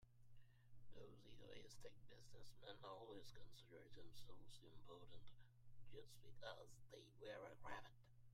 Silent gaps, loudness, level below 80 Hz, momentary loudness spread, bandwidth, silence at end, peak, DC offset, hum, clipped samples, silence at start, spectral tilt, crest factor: none; -63 LUFS; -74 dBFS; 9 LU; 15.5 kHz; 0 s; -40 dBFS; under 0.1%; none; under 0.1%; 0 s; -4.5 dB/octave; 18 dB